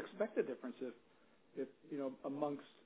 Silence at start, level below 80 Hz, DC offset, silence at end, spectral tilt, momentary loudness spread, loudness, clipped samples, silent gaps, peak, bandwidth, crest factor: 0 s; under -90 dBFS; under 0.1%; 0.15 s; -5.5 dB/octave; 10 LU; -44 LUFS; under 0.1%; none; -24 dBFS; 4 kHz; 20 dB